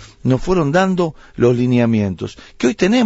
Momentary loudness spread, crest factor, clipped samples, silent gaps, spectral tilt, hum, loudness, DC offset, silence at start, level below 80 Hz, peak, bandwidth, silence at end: 8 LU; 14 dB; under 0.1%; none; -7 dB/octave; none; -16 LUFS; under 0.1%; 0 s; -38 dBFS; -2 dBFS; 8 kHz; 0 s